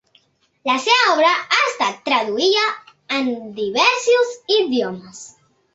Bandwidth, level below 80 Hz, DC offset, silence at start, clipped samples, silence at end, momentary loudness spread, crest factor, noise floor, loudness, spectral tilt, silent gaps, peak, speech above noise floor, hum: 8.2 kHz; -68 dBFS; under 0.1%; 0.65 s; under 0.1%; 0.5 s; 13 LU; 16 dB; -59 dBFS; -17 LUFS; -2 dB/octave; none; -2 dBFS; 41 dB; none